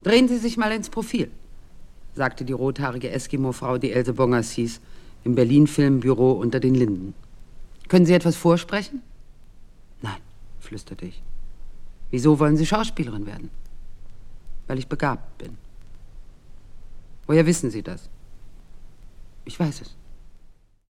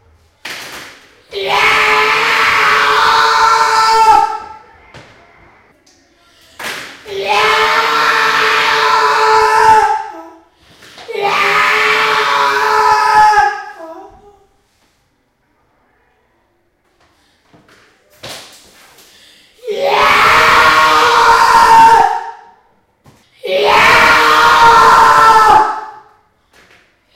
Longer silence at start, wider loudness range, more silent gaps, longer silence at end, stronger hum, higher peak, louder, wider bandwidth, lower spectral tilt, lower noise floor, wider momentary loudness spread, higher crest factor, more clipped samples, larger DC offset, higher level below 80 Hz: second, 0.05 s vs 0.45 s; first, 13 LU vs 8 LU; neither; second, 0.35 s vs 1.2 s; neither; second, -4 dBFS vs 0 dBFS; second, -22 LUFS vs -8 LUFS; about the same, 15.5 kHz vs 16.5 kHz; first, -6.5 dB/octave vs -1.5 dB/octave; second, -49 dBFS vs -59 dBFS; about the same, 22 LU vs 20 LU; first, 20 dB vs 12 dB; second, under 0.1% vs 0.2%; neither; about the same, -40 dBFS vs -44 dBFS